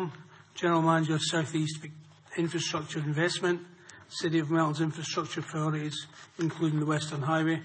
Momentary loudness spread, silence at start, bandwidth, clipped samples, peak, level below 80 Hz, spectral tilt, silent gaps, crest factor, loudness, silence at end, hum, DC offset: 13 LU; 0 s; 8.8 kHz; under 0.1%; -12 dBFS; -74 dBFS; -5 dB/octave; none; 20 dB; -30 LUFS; 0 s; none; under 0.1%